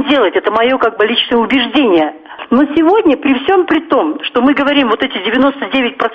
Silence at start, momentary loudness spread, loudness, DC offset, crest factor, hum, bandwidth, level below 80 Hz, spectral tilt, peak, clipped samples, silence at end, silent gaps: 0 s; 4 LU; -12 LUFS; under 0.1%; 12 dB; none; 5.8 kHz; -48 dBFS; -6 dB/octave; 0 dBFS; under 0.1%; 0 s; none